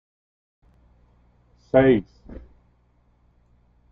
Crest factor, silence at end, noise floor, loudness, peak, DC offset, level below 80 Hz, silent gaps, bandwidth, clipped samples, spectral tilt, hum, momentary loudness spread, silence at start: 24 dB; 1.55 s; -62 dBFS; -19 LUFS; -2 dBFS; under 0.1%; -50 dBFS; none; 5.2 kHz; under 0.1%; -6.5 dB/octave; 60 Hz at -50 dBFS; 28 LU; 1.75 s